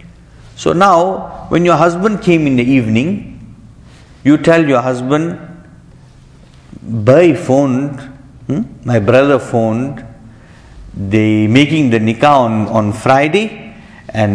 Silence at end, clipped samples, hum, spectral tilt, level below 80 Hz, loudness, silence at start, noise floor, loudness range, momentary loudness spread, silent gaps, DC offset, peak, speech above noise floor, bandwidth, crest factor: 0 s; 0.2%; none; -7 dB/octave; -42 dBFS; -12 LUFS; 0.45 s; -40 dBFS; 4 LU; 14 LU; none; under 0.1%; 0 dBFS; 29 dB; 11 kHz; 14 dB